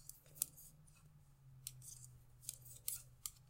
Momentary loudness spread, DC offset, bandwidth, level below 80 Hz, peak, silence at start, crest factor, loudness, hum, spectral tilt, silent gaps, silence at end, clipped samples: 22 LU; under 0.1%; 16 kHz; -70 dBFS; -14 dBFS; 0 s; 40 dB; -49 LUFS; none; -1 dB/octave; none; 0 s; under 0.1%